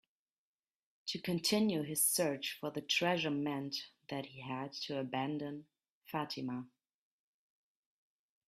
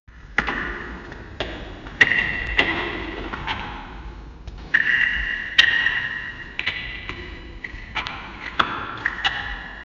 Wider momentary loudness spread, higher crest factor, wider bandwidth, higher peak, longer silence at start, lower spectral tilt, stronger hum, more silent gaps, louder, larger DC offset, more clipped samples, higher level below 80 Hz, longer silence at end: second, 13 LU vs 20 LU; second, 20 dB vs 26 dB; first, 15.5 kHz vs 9.4 kHz; second, -20 dBFS vs 0 dBFS; first, 1.05 s vs 0.1 s; about the same, -3.5 dB/octave vs -3 dB/octave; neither; first, 5.90-6.02 s vs none; second, -37 LUFS vs -22 LUFS; neither; neither; second, -80 dBFS vs -40 dBFS; first, 1.8 s vs 0.15 s